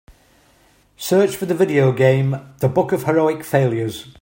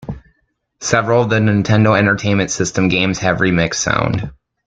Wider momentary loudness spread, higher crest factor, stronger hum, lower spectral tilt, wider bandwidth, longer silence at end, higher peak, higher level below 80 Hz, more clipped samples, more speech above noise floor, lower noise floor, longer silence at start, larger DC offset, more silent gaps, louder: second, 8 LU vs 11 LU; about the same, 16 dB vs 14 dB; neither; first, -6.5 dB/octave vs -5 dB/octave; first, 16.5 kHz vs 9.2 kHz; second, 0.1 s vs 0.35 s; about the same, -2 dBFS vs -2 dBFS; second, -54 dBFS vs -42 dBFS; neither; second, 38 dB vs 50 dB; second, -55 dBFS vs -65 dBFS; first, 1 s vs 0 s; neither; neither; second, -18 LUFS vs -15 LUFS